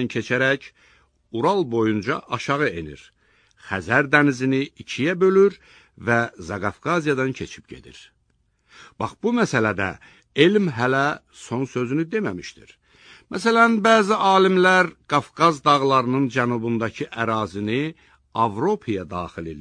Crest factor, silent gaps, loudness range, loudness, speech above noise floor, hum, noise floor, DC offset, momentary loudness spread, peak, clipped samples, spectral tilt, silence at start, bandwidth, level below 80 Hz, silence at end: 20 dB; none; 7 LU; -21 LUFS; 45 dB; none; -67 dBFS; under 0.1%; 14 LU; -2 dBFS; under 0.1%; -5.5 dB/octave; 0 s; 10 kHz; -56 dBFS; 0 s